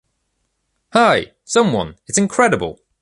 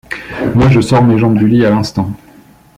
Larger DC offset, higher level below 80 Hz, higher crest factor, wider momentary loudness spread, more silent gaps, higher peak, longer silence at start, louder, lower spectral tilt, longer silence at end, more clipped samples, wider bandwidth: neither; second, -50 dBFS vs -34 dBFS; first, 18 dB vs 10 dB; second, 8 LU vs 12 LU; neither; about the same, -2 dBFS vs -2 dBFS; first, 0.95 s vs 0.1 s; second, -17 LUFS vs -11 LUFS; second, -4 dB/octave vs -7.5 dB/octave; second, 0.3 s vs 0.6 s; neither; about the same, 11.5 kHz vs 12 kHz